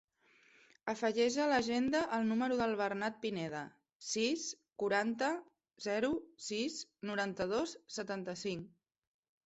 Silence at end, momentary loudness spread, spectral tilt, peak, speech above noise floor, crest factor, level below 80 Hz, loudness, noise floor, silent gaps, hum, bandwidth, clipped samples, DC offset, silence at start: 0.8 s; 11 LU; -4 dB/octave; -20 dBFS; 33 dB; 18 dB; -72 dBFS; -36 LUFS; -69 dBFS; 3.95-4.00 s; none; 8.2 kHz; under 0.1%; under 0.1%; 0.85 s